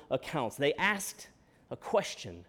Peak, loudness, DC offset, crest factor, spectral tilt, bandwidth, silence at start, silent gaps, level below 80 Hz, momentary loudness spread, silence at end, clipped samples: -14 dBFS; -32 LUFS; under 0.1%; 20 dB; -3.5 dB/octave; 19 kHz; 0 s; none; -66 dBFS; 19 LU; 0.05 s; under 0.1%